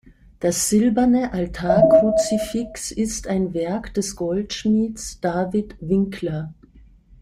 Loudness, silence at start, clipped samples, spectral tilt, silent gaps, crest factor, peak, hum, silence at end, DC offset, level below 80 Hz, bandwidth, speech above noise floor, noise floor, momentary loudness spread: -21 LUFS; 0.4 s; under 0.1%; -5.5 dB/octave; none; 18 dB; -4 dBFS; none; 0.4 s; under 0.1%; -44 dBFS; 15.5 kHz; 29 dB; -49 dBFS; 11 LU